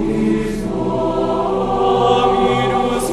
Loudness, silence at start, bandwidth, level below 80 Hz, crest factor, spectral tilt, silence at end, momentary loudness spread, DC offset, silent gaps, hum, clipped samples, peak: -17 LUFS; 0 s; 13.5 kHz; -34 dBFS; 14 dB; -6 dB/octave; 0 s; 6 LU; under 0.1%; none; none; under 0.1%; -2 dBFS